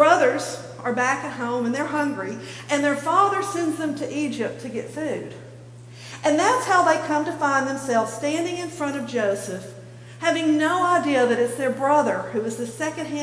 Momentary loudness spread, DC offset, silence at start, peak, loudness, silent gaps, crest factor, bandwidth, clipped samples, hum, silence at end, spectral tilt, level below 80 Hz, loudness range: 13 LU; under 0.1%; 0 s; -4 dBFS; -23 LUFS; none; 20 dB; 11 kHz; under 0.1%; none; 0 s; -4.5 dB/octave; -64 dBFS; 3 LU